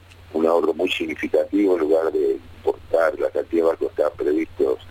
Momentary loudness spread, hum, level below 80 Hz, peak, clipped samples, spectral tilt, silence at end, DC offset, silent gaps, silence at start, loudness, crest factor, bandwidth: 5 LU; none; -52 dBFS; -6 dBFS; under 0.1%; -5.5 dB/octave; 0 s; under 0.1%; none; 0.3 s; -21 LUFS; 16 dB; 16 kHz